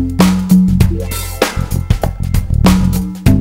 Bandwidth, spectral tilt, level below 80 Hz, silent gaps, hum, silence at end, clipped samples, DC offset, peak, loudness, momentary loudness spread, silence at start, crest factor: 16.5 kHz; -6.5 dB/octave; -20 dBFS; none; none; 0 s; 0.3%; under 0.1%; 0 dBFS; -13 LUFS; 8 LU; 0 s; 12 dB